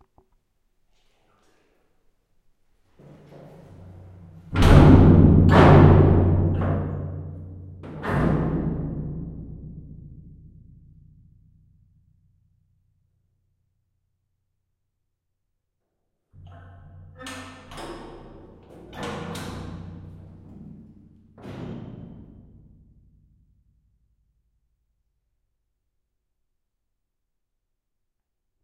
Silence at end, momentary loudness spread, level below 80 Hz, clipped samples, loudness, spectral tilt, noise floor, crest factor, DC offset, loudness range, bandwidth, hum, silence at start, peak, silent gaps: 6.65 s; 28 LU; -34 dBFS; under 0.1%; -18 LUFS; -8.5 dB/octave; -79 dBFS; 22 dB; under 0.1%; 27 LU; 10 kHz; none; 4.5 s; -2 dBFS; none